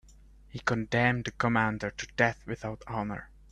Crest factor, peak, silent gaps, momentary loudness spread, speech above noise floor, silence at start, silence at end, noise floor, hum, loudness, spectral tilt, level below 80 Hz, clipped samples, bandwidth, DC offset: 22 dB; -10 dBFS; none; 11 LU; 25 dB; 0.55 s; 0.25 s; -55 dBFS; none; -30 LUFS; -6 dB/octave; -54 dBFS; under 0.1%; 9.8 kHz; under 0.1%